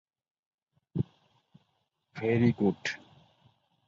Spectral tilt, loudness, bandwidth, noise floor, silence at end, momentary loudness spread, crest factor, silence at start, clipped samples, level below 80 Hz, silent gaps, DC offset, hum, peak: -7 dB/octave; -30 LUFS; 7.6 kHz; -78 dBFS; 0.9 s; 15 LU; 22 dB; 0.95 s; under 0.1%; -62 dBFS; none; under 0.1%; none; -12 dBFS